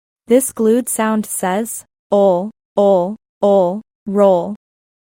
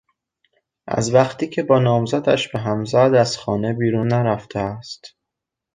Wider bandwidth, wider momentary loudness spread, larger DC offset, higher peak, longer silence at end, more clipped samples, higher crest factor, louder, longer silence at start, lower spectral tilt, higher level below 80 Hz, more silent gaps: first, 16.5 kHz vs 9.6 kHz; about the same, 11 LU vs 11 LU; neither; about the same, -2 dBFS vs -2 dBFS; about the same, 0.65 s vs 0.65 s; neither; about the same, 16 dB vs 18 dB; first, -16 LUFS vs -19 LUFS; second, 0.3 s vs 0.85 s; about the same, -5.5 dB/octave vs -6 dB/octave; second, -62 dBFS vs -52 dBFS; first, 1.99-2.10 s, 2.65-2.76 s, 3.29-3.41 s, 3.95-4.06 s vs none